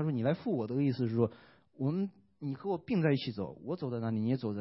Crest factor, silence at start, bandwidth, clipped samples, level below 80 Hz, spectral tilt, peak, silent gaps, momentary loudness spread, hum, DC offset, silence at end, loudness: 18 dB; 0 s; 5.8 kHz; under 0.1%; -72 dBFS; -11.5 dB/octave; -16 dBFS; none; 8 LU; none; under 0.1%; 0 s; -34 LUFS